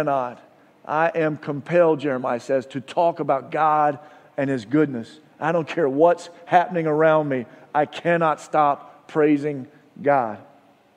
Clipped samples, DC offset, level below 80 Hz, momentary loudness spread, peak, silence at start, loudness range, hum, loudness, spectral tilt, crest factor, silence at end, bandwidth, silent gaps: under 0.1%; under 0.1%; -74 dBFS; 12 LU; -2 dBFS; 0 s; 2 LU; none; -22 LUFS; -7 dB/octave; 20 dB; 0.55 s; 10 kHz; none